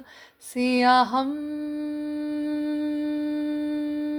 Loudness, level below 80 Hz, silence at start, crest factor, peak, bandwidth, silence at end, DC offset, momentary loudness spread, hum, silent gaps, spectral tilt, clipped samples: -25 LUFS; -66 dBFS; 0 s; 20 dB; -6 dBFS; 19 kHz; 0 s; under 0.1%; 12 LU; none; none; -4 dB/octave; under 0.1%